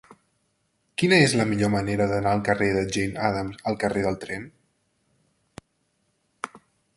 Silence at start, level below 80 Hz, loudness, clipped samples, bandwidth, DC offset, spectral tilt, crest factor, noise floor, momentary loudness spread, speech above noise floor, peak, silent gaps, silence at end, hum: 1 s; -52 dBFS; -23 LUFS; under 0.1%; 11.5 kHz; under 0.1%; -5 dB/octave; 22 dB; -71 dBFS; 19 LU; 48 dB; -4 dBFS; none; 0.4 s; none